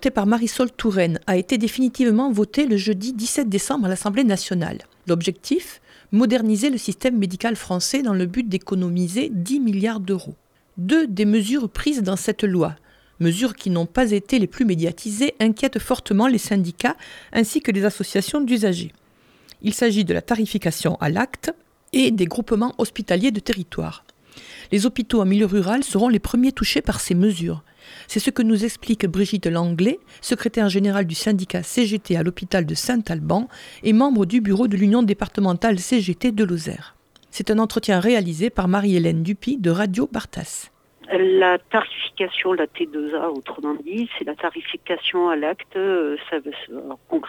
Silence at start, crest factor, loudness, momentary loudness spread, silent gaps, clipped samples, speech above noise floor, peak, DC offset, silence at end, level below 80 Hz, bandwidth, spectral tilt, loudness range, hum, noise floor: 0 s; 18 dB; -21 LUFS; 9 LU; none; under 0.1%; 33 dB; -4 dBFS; under 0.1%; 0 s; -46 dBFS; 16.5 kHz; -5.5 dB/octave; 3 LU; none; -54 dBFS